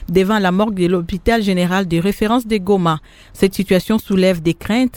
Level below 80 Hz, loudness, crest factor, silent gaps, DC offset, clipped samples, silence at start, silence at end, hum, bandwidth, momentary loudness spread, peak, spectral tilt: -36 dBFS; -16 LUFS; 16 dB; none; under 0.1%; under 0.1%; 0 s; 0 s; none; 18 kHz; 4 LU; 0 dBFS; -6.5 dB/octave